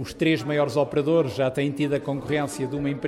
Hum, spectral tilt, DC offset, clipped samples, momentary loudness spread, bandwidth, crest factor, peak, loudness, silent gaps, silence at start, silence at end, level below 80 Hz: none; -6.5 dB/octave; under 0.1%; under 0.1%; 5 LU; 14.5 kHz; 14 dB; -10 dBFS; -24 LUFS; none; 0 s; 0 s; -54 dBFS